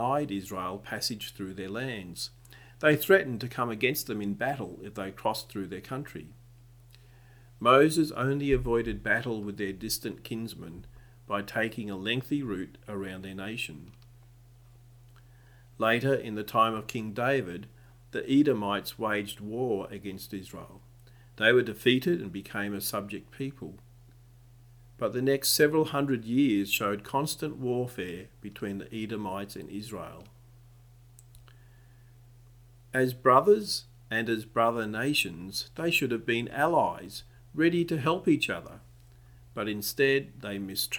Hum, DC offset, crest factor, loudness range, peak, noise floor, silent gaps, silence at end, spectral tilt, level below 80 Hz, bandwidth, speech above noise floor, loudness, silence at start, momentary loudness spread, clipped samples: none; under 0.1%; 24 dB; 9 LU; -6 dBFS; -55 dBFS; none; 0 s; -4.5 dB/octave; -54 dBFS; over 20 kHz; 26 dB; -29 LUFS; 0 s; 15 LU; under 0.1%